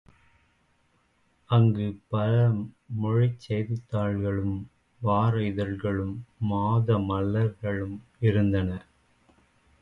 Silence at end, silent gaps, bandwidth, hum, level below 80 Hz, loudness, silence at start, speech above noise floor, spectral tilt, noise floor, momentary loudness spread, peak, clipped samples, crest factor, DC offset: 1 s; none; 5.2 kHz; none; -48 dBFS; -27 LUFS; 1.5 s; 42 dB; -9.5 dB/octave; -68 dBFS; 10 LU; -10 dBFS; under 0.1%; 16 dB; under 0.1%